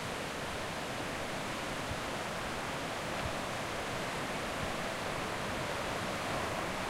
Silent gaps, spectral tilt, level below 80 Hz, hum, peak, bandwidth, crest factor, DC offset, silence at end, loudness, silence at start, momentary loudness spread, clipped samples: none; -3.5 dB/octave; -54 dBFS; none; -24 dBFS; 16 kHz; 14 dB; under 0.1%; 0 s; -37 LUFS; 0 s; 2 LU; under 0.1%